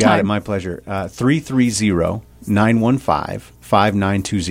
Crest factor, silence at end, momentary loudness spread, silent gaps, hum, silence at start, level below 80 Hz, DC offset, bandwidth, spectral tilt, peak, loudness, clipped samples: 16 dB; 0 s; 10 LU; none; none; 0 s; -42 dBFS; under 0.1%; 16 kHz; -5.5 dB/octave; 0 dBFS; -18 LUFS; under 0.1%